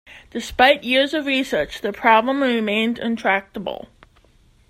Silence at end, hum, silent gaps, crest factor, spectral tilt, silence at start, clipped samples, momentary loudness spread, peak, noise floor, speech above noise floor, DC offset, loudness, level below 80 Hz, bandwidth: 0.85 s; none; none; 20 dB; -4 dB/octave; 0.1 s; under 0.1%; 15 LU; 0 dBFS; -55 dBFS; 35 dB; under 0.1%; -19 LUFS; -50 dBFS; 16 kHz